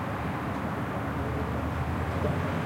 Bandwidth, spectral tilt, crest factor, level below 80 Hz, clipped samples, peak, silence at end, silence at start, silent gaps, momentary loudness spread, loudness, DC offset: 16.5 kHz; -7.5 dB/octave; 14 dB; -44 dBFS; under 0.1%; -16 dBFS; 0 s; 0 s; none; 3 LU; -31 LUFS; under 0.1%